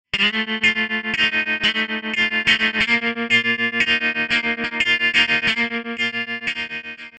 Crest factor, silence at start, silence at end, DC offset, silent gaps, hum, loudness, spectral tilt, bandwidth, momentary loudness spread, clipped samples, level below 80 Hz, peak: 18 dB; 0.15 s; 0 s; under 0.1%; none; none; -18 LUFS; -2.5 dB/octave; 10.5 kHz; 7 LU; under 0.1%; -54 dBFS; -4 dBFS